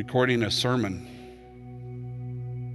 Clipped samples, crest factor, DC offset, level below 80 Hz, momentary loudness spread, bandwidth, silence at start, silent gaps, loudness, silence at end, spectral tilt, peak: under 0.1%; 20 dB; under 0.1%; -54 dBFS; 22 LU; 12.5 kHz; 0 s; none; -27 LUFS; 0 s; -5 dB/octave; -10 dBFS